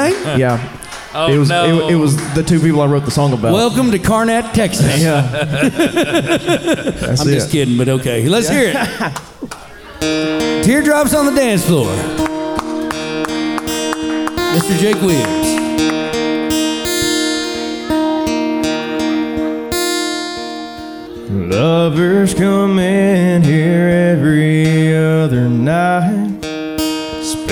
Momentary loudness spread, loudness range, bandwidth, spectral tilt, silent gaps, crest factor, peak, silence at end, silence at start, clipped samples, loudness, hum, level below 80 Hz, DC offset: 9 LU; 5 LU; over 20 kHz; -5.5 dB/octave; none; 12 dB; -2 dBFS; 0 s; 0 s; under 0.1%; -14 LUFS; none; -40 dBFS; 0.1%